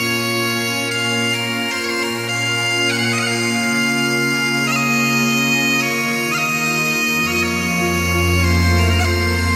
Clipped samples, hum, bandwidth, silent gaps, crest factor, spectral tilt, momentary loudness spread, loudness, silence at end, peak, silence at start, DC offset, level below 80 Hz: under 0.1%; none; 16.5 kHz; none; 14 dB; -3.5 dB/octave; 4 LU; -16 LUFS; 0 s; -4 dBFS; 0 s; under 0.1%; -34 dBFS